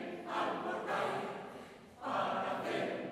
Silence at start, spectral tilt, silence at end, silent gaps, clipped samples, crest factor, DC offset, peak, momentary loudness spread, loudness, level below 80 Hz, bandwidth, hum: 0 s; -5 dB/octave; 0 s; none; under 0.1%; 16 dB; under 0.1%; -22 dBFS; 12 LU; -38 LUFS; -78 dBFS; 15 kHz; none